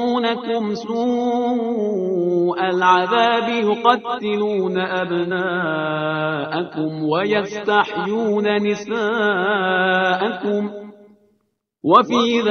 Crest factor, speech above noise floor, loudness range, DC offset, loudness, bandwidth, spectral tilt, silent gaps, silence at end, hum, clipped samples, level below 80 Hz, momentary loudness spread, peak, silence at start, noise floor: 18 dB; 50 dB; 3 LU; under 0.1%; -19 LUFS; 6.6 kHz; -5.5 dB/octave; none; 0 s; none; under 0.1%; -64 dBFS; 7 LU; 0 dBFS; 0 s; -68 dBFS